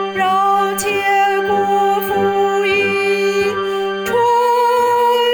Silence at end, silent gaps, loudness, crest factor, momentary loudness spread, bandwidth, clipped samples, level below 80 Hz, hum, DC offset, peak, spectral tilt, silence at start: 0 s; none; -15 LUFS; 8 dB; 4 LU; over 20 kHz; under 0.1%; -54 dBFS; none; under 0.1%; -6 dBFS; -3.5 dB/octave; 0 s